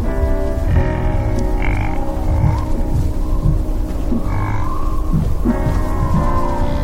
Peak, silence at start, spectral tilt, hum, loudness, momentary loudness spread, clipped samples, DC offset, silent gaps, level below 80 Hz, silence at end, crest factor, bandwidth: -2 dBFS; 0 s; -8 dB/octave; none; -19 LUFS; 4 LU; under 0.1%; under 0.1%; none; -18 dBFS; 0 s; 14 dB; 15 kHz